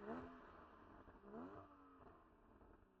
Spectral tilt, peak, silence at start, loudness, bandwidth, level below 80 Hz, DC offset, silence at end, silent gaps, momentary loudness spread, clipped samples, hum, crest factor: -6 dB/octave; -38 dBFS; 0 s; -61 LUFS; 6.2 kHz; -74 dBFS; under 0.1%; 0 s; none; 14 LU; under 0.1%; none; 20 dB